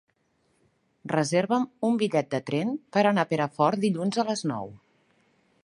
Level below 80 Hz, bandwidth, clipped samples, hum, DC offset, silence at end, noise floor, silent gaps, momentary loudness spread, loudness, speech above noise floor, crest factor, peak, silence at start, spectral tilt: -72 dBFS; 11.5 kHz; under 0.1%; none; under 0.1%; 0.85 s; -70 dBFS; none; 7 LU; -26 LUFS; 45 dB; 18 dB; -8 dBFS; 1.05 s; -5.5 dB/octave